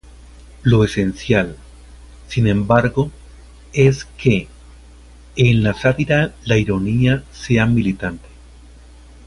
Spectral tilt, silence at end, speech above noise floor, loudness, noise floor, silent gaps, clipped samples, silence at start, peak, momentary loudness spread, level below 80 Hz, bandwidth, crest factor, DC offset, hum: -7 dB/octave; 1.1 s; 26 dB; -17 LUFS; -42 dBFS; none; under 0.1%; 0.05 s; 0 dBFS; 11 LU; -38 dBFS; 11.5 kHz; 18 dB; under 0.1%; none